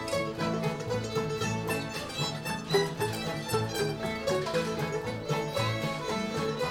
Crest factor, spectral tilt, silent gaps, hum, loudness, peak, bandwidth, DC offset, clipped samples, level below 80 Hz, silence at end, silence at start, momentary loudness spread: 18 dB; -5 dB/octave; none; none; -31 LUFS; -14 dBFS; 18 kHz; under 0.1%; under 0.1%; -56 dBFS; 0 s; 0 s; 4 LU